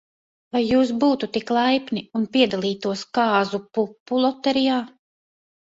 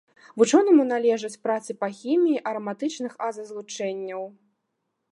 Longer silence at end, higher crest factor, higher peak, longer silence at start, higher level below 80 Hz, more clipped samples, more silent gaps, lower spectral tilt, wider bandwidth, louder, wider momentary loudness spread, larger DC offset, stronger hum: about the same, 0.8 s vs 0.85 s; about the same, 16 dB vs 20 dB; about the same, -6 dBFS vs -6 dBFS; first, 0.55 s vs 0.35 s; first, -60 dBFS vs -82 dBFS; neither; first, 4.00-4.06 s vs none; about the same, -5.5 dB/octave vs -4.5 dB/octave; second, 7.8 kHz vs 11.5 kHz; about the same, -22 LUFS vs -24 LUFS; second, 7 LU vs 16 LU; neither; neither